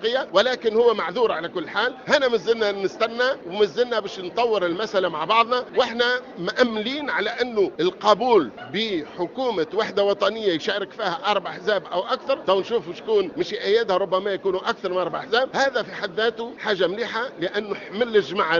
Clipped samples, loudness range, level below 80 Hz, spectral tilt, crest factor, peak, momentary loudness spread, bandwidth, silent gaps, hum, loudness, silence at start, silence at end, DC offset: under 0.1%; 2 LU; -64 dBFS; -4 dB/octave; 20 dB; -2 dBFS; 7 LU; 7.4 kHz; none; none; -23 LUFS; 0 s; 0 s; under 0.1%